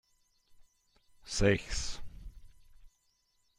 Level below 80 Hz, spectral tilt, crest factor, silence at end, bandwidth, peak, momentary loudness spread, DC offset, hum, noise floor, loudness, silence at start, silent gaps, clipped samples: -46 dBFS; -4.5 dB/octave; 24 dB; 0.7 s; 11.5 kHz; -12 dBFS; 24 LU; under 0.1%; none; -75 dBFS; -33 LUFS; 0.6 s; none; under 0.1%